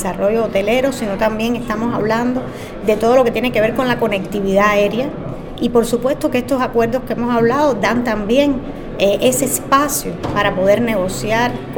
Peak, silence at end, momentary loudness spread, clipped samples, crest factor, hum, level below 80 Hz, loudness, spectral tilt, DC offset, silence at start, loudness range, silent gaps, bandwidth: 0 dBFS; 0 s; 7 LU; under 0.1%; 16 dB; none; -36 dBFS; -16 LUFS; -4.5 dB/octave; under 0.1%; 0 s; 1 LU; none; 19 kHz